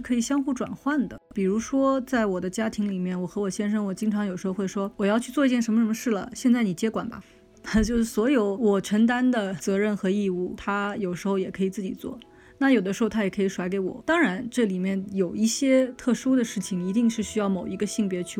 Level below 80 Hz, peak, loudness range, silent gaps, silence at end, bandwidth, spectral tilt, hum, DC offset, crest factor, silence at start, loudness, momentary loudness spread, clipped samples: -50 dBFS; -10 dBFS; 3 LU; none; 0 s; 16 kHz; -5.5 dB/octave; none; under 0.1%; 16 dB; 0 s; -25 LUFS; 7 LU; under 0.1%